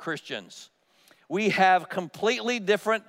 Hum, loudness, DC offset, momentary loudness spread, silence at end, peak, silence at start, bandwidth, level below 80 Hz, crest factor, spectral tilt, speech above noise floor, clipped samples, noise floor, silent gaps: none; -25 LUFS; under 0.1%; 16 LU; 0.1 s; -8 dBFS; 0 s; 16 kHz; -80 dBFS; 18 dB; -4 dB/octave; 35 dB; under 0.1%; -61 dBFS; none